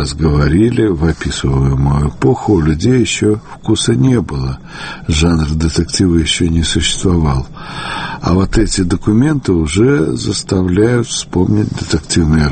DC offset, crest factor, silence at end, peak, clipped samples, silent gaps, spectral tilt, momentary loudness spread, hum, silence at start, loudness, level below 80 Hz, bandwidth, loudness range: under 0.1%; 12 dB; 0 s; 0 dBFS; under 0.1%; none; -5.5 dB/octave; 8 LU; none; 0 s; -13 LUFS; -24 dBFS; 8.8 kHz; 1 LU